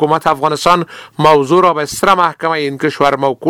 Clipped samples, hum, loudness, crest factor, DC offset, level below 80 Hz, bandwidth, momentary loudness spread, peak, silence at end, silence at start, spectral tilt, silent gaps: 0.2%; none; -12 LUFS; 12 dB; under 0.1%; -48 dBFS; 20 kHz; 6 LU; 0 dBFS; 0 s; 0 s; -5 dB/octave; none